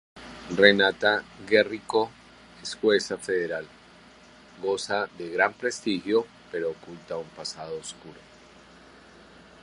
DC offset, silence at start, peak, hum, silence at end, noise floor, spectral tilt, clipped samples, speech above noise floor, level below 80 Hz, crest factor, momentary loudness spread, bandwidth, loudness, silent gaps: under 0.1%; 0.15 s; -2 dBFS; none; 1.5 s; -52 dBFS; -3.5 dB/octave; under 0.1%; 26 dB; -64 dBFS; 26 dB; 16 LU; 11.5 kHz; -26 LUFS; none